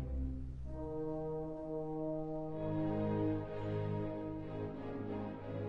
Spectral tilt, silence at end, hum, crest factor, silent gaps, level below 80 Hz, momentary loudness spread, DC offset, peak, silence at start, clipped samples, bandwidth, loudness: -10.5 dB/octave; 0 s; none; 14 dB; none; -50 dBFS; 7 LU; under 0.1%; -24 dBFS; 0 s; under 0.1%; 5.6 kHz; -41 LUFS